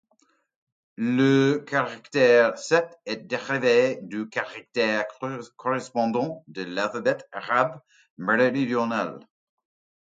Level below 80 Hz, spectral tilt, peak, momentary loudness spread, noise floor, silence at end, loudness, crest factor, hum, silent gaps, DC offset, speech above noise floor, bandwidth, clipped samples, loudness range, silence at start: -74 dBFS; -5.5 dB/octave; -4 dBFS; 12 LU; -67 dBFS; 0.85 s; -24 LUFS; 20 dB; none; 8.10-8.17 s; under 0.1%; 43 dB; 9 kHz; under 0.1%; 5 LU; 1 s